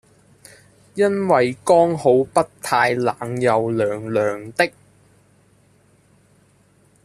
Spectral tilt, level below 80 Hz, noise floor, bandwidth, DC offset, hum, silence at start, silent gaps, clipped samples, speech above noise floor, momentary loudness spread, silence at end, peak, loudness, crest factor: -5.5 dB/octave; -60 dBFS; -56 dBFS; 14 kHz; under 0.1%; none; 0.95 s; none; under 0.1%; 38 dB; 6 LU; 2.35 s; -2 dBFS; -19 LUFS; 18 dB